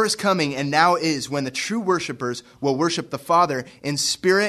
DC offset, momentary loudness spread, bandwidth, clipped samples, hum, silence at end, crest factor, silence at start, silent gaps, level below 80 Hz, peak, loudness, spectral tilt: under 0.1%; 9 LU; 13.5 kHz; under 0.1%; none; 0 s; 20 dB; 0 s; none; -62 dBFS; -2 dBFS; -22 LUFS; -3.5 dB/octave